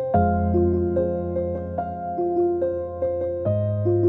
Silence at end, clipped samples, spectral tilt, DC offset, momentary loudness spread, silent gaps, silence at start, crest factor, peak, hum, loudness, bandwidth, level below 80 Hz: 0 s; under 0.1%; -13 dB/octave; under 0.1%; 7 LU; none; 0 s; 16 dB; -6 dBFS; none; -24 LUFS; 3.1 kHz; -40 dBFS